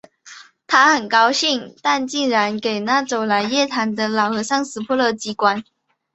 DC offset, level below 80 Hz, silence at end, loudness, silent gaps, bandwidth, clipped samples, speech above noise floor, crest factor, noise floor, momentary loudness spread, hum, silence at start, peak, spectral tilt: under 0.1%; -66 dBFS; 0.5 s; -18 LUFS; none; 8.2 kHz; under 0.1%; 25 dB; 18 dB; -43 dBFS; 7 LU; none; 0.25 s; -2 dBFS; -2.5 dB/octave